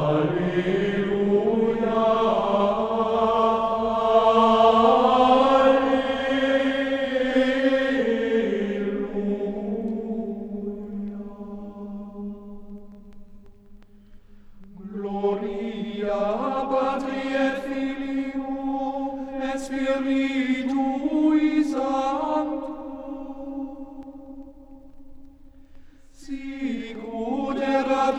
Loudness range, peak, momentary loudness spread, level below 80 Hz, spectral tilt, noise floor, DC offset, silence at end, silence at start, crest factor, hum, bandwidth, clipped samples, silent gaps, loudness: 19 LU; -4 dBFS; 19 LU; -50 dBFS; -6.5 dB/octave; -47 dBFS; under 0.1%; 0 s; 0 s; 18 dB; none; 10.5 kHz; under 0.1%; none; -23 LUFS